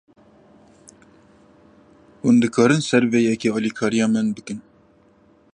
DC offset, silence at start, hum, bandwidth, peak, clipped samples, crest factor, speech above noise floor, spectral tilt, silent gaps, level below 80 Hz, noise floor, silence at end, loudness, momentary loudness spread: under 0.1%; 2.25 s; none; 10 kHz; -4 dBFS; under 0.1%; 18 dB; 37 dB; -5.5 dB/octave; none; -62 dBFS; -55 dBFS; 0.95 s; -19 LUFS; 11 LU